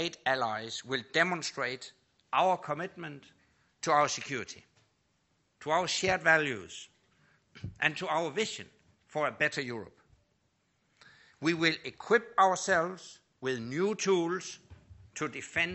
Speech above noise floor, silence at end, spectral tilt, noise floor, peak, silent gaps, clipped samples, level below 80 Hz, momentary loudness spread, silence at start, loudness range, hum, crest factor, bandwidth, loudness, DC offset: 44 dB; 0 s; -3.5 dB/octave; -75 dBFS; -10 dBFS; none; under 0.1%; -68 dBFS; 18 LU; 0 s; 4 LU; none; 24 dB; 8.2 kHz; -31 LUFS; under 0.1%